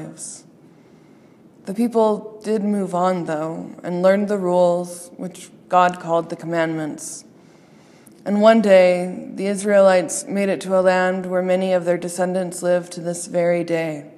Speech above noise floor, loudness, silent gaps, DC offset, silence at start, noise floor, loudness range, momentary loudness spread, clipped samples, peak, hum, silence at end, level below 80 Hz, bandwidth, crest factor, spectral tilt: 30 dB; -19 LUFS; none; under 0.1%; 0 s; -49 dBFS; 6 LU; 18 LU; under 0.1%; 0 dBFS; none; 0.05 s; -72 dBFS; 13 kHz; 20 dB; -5.5 dB/octave